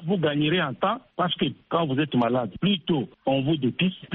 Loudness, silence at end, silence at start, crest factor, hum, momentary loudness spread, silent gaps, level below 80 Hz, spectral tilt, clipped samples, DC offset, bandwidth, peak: -25 LUFS; 0 s; 0 s; 14 dB; none; 4 LU; none; -60 dBFS; -4.5 dB/octave; under 0.1%; under 0.1%; 4.1 kHz; -10 dBFS